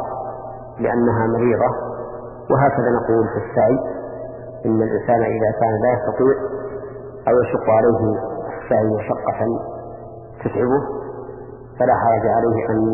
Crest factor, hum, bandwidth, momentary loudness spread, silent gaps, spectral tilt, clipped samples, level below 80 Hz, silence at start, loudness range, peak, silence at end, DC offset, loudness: 16 dB; none; 2.9 kHz; 16 LU; none; -13.5 dB/octave; under 0.1%; -46 dBFS; 0 s; 3 LU; -4 dBFS; 0 s; under 0.1%; -19 LUFS